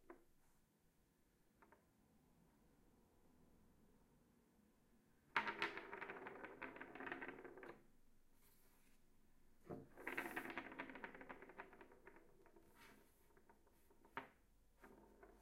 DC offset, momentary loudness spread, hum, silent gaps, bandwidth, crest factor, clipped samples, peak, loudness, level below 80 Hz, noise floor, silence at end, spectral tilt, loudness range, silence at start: under 0.1%; 21 LU; none; none; 15.5 kHz; 32 dB; under 0.1%; -24 dBFS; -52 LUFS; -76 dBFS; -79 dBFS; 0 s; -4 dB/octave; 13 LU; 0 s